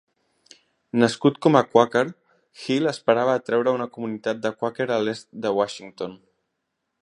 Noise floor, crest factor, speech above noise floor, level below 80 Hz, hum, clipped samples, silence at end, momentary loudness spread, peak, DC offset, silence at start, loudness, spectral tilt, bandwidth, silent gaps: -78 dBFS; 22 dB; 56 dB; -70 dBFS; none; under 0.1%; 0.85 s; 12 LU; -2 dBFS; under 0.1%; 0.95 s; -22 LUFS; -6 dB/octave; 11 kHz; none